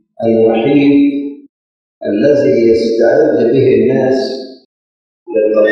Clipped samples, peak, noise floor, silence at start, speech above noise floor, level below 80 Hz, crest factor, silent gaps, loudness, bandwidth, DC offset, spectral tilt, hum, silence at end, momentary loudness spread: under 0.1%; 0 dBFS; under -90 dBFS; 0.2 s; over 80 dB; -50 dBFS; 12 dB; 1.49-2.01 s, 4.65-5.26 s; -11 LUFS; 7.6 kHz; under 0.1%; -7.5 dB/octave; none; 0 s; 11 LU